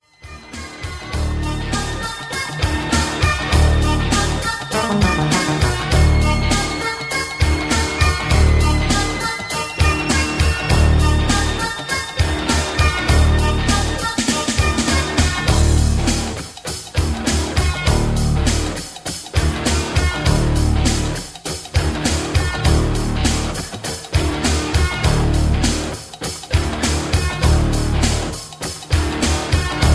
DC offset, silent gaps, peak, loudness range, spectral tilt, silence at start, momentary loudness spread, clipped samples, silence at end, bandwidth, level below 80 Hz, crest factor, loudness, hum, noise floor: under 0.1%; none; -2 dBFS; 3 LU; -4.5 dB/octave; 0.25 s; 9 LU; under 0.1%; 0 s; 11 kHz; -22 dBFS; 16 dB; -18 LUFS; none; -38 dBFS